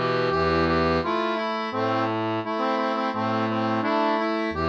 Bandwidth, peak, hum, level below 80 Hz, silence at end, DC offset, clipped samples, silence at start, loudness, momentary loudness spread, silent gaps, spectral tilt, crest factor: 8 kHz; -12 dBFS; none; -46 dBFS; 0 s; under 0.1%; under 0.1%; 0 s; -24 LUFS; 4 LU; none; -7 dB/octave; 12 dB